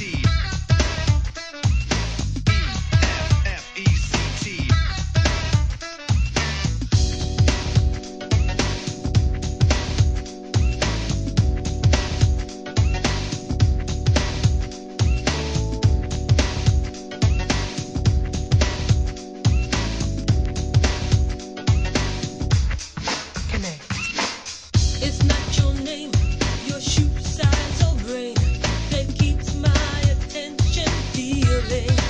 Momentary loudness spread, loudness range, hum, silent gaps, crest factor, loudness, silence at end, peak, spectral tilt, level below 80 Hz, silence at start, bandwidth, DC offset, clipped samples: 6 LU; 1 LU; none; none; 16 dB; -22 LUFS; 0 s; -4 dBFS; -5 dB/octave; -26 dBFS; 0 s; 9.6 kHz; 0.1%; under 0.1%